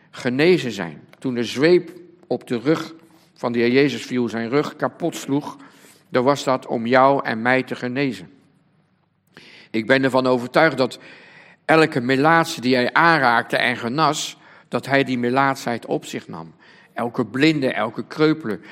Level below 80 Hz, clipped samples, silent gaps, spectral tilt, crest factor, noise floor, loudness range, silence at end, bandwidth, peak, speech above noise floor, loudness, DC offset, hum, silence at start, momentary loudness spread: -68 dBFS; under 0.1%; none; -5 dB/octave; 20 dB; -63 dBFS; 5 LU; 0 s; 16 kHz; 0 dBFS; 44 dB; -20 LUFS; under 0.1%; none; 0.15 s; 13 LU